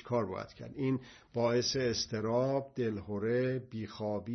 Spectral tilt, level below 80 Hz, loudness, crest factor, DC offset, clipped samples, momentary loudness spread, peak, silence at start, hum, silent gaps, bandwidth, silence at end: -5 dB/octave; -64 dBFS; -34 LUFS; 14 dB; under 0.1%; under 0.1%; 9 LU; -20 dBFS; 0 s; none; none; 6.4 kHz; 0 s